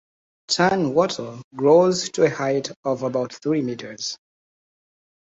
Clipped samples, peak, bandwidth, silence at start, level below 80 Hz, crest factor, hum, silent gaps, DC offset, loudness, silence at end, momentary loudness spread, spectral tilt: under 0.1%; -4 dBFS; 8.2 kHz; 0.5 s; -62 dBFS; 18 dB; none; 1.44-1.51 s, 2.76-2.83 s; under 0.1%; -21 LUFS; 1.1 s; 13 LU; -4.5 dB/octave